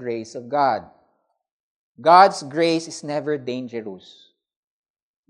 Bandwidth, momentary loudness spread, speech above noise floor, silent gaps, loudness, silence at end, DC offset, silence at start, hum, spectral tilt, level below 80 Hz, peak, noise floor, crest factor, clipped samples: 10.5 kHz; 18 LU; 48 dB; 1.51-1.95 s; -20 LUFS; 1.3 s; under 0.1%; 0 s; none; -4.5 dB/octave; -76 dBFS; 0 dBFS; -68 dBFS; 22 dB; under 0.1%